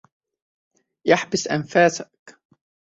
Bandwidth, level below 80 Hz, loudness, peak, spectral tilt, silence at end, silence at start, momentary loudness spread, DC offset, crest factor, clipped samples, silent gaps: 8 kHz; -64 dBFS; -20 LUFS; -2 dBFS; -4 dB/octave; 0.6 s; 1.05 s; 14 LU; under 0.1%; 22 dB; under 0.1%; 2.19-2.26 s